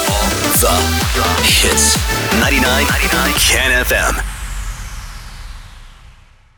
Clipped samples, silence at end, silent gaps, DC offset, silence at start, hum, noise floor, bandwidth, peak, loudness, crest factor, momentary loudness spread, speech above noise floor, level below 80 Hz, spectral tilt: under 0.1%; 0.45 s; none; under 0.1%; 0 s; none; -43 dBFS; over 20 kHz; -2 dBFS; -12 LUFS; 14 dB; 19 LU; 30 dB; -24 dBFS; -2.5 dB/octave